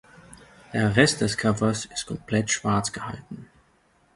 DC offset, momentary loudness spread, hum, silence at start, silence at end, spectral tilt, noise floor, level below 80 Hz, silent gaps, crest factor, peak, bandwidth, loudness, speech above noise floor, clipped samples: under 0.1%; 17 LU; none; 0.3 s; 0.7 s; -4.5 dB/octave; -63 dBFS; -52 dBFS; none; 24 dB; -2 dBFS; 11.5 kHz; -24 LUFS; 38 dB; under 0.1%